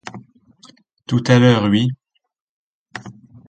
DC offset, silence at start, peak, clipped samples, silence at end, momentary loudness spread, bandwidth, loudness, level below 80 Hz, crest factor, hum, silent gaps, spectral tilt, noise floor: under 0.1%; 0.05 s; 0 dBFS; under 0.1%; 0.35 s; 24 LU; 8.8 kHz; -15 LUFS; -52 dBFS; 20 dB; none; 2.41-2.86 s; -6.5 dB/octave; -50 dBFS